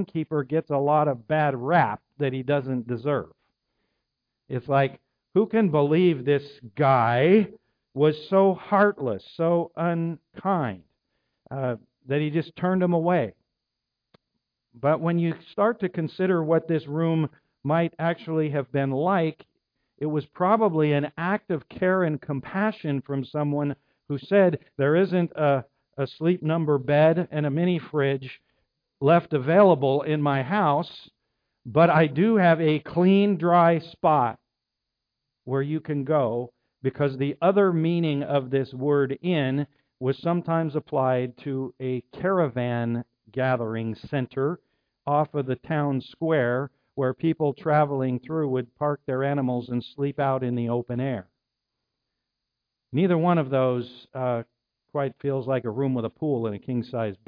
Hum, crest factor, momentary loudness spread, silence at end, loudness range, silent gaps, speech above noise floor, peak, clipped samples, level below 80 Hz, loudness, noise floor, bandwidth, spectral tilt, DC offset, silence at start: none; 18 dB; 11 LU; 0.15 s; 6 LU; none; 60 dB; -6 dBFS; under 0.1%; -68 dBFS; -24 LUFS; -84 dBFS; 5.2 kHz; -10.5 dB/octave; under 0.1%; 0 s